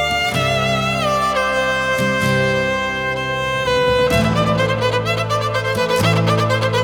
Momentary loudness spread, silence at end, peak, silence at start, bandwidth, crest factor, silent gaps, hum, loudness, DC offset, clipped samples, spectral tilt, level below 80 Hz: 4 LU; 0 s; -4 dBFS; 0 s; 19 kHz; 14 dB; none; none; -17 LUFS; under 0.1%; under 0.1%; -5 dB/octave; -38 dBFS